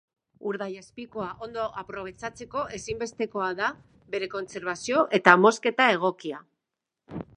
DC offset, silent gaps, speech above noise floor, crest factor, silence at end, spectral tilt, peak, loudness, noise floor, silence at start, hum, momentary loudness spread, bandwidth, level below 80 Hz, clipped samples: under 0.1%; none; 59 dB; 28 dB; 0.15 s; -4 dB/octave; 0 dBFS; -26 LUFS; -86 dBFS; 0.45 s; none; 19 LU; 11 kHz; -62 dBFS; under 0.1%